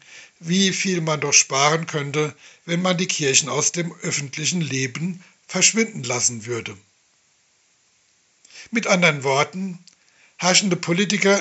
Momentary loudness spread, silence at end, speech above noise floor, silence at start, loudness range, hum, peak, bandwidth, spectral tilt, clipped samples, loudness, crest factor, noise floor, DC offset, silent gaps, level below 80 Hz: 13 LU; 0 s; 41 dB; 0.1 s; 4 LU; none; 0 dBFS; 8.2 kHz; -3 dB/octave; under 0.1%; -20 LUFS; 22 dB; -62 dBFS; under 0.1%; none; -74 dBFS